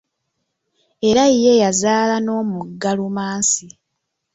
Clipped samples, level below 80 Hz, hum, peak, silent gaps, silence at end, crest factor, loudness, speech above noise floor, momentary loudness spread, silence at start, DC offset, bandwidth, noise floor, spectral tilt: under 0.1%; -56 dBFS; none; -2 dBFS; none; 0.65 s; 16 dB; -17 LUFS; 59 dB; 10 LU; 1 s; under 0.1%; 8.4 kHz; -76 dBFS; -3.5 dB/octave